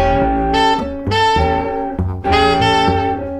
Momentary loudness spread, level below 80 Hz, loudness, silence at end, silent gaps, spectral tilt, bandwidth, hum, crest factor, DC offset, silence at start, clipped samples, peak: 8 LU; -28 dBFS; -15 LUFS; 0 s; none; -5.5 dB/octave; 12 kHz; none; 14 dB; under 0.1%; 0 s; under 0.1%; -2 dBFS